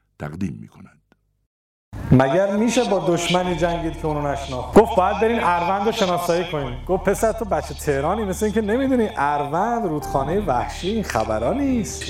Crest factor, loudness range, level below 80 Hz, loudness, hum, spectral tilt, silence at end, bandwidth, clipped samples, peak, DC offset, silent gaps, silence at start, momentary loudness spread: 18 dB; 2 LU; -38 dBFS; -21 LUFS; none; -5.5 dB/octave; 0 s; 16 kHz; under 0.1%; -2 dBFS; under 0.1%; 1.46-1.92 s; 0.2 s; 9 LU